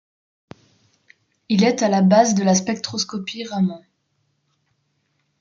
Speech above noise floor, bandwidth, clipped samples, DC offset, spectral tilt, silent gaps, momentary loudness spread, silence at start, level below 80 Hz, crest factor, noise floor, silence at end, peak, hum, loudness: 51 dB; 7.6 kHz; under 0.1%; under 0.1%; -5 dB/octave; none; 12 LU; 1.5 s; -66 dBFS; 20 dB; -69 dBFS; 1.65 s; -2 dBFS; none; -19 LUFS